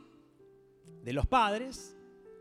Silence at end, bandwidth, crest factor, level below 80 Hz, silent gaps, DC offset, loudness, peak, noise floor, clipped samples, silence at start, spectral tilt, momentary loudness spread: 0 s; 15 kHz; 20 dB; -44 dBFS; none; under 0.1%; -31 LUFS; -14 dBFS; -60 dBFS; under 0.1%; 0.85 s; -5 dB/octave; 19 LU